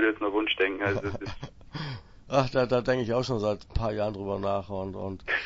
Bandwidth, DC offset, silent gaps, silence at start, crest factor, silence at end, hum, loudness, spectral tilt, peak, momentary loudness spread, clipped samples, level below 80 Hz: 7.8 kHz; under 0.1%; none; 0 s; 18 dB; 0 s; none; -29 LUFS; -6 dB/octave; -10 dBFS; 13 LU; under 0.1%; -44 dBFS